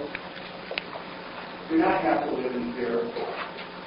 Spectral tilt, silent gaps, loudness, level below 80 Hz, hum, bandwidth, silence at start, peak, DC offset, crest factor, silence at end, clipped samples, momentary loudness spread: -9.5 dB/octave; none; -29 LUFS; -60 dBFS; none; 5.6 kHz; 0 s; -8 dBFS; under 0.1%; 22 dB; 0 s; under 0.1%; 14 LU